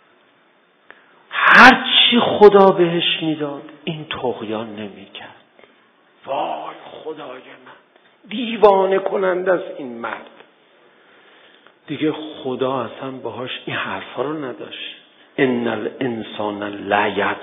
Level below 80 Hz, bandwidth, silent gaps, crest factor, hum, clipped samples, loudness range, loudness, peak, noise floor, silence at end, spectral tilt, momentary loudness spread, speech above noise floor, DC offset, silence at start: -58 dBFS; 11 kHz; none; 20 dB; none; under 0.1%; 17 LU; -16 LUFS; 0 dBFS; -56 dBFS; 0 s; -5 dB/octave; 21 LU; 37 dB; under 0.1%; 1.3 s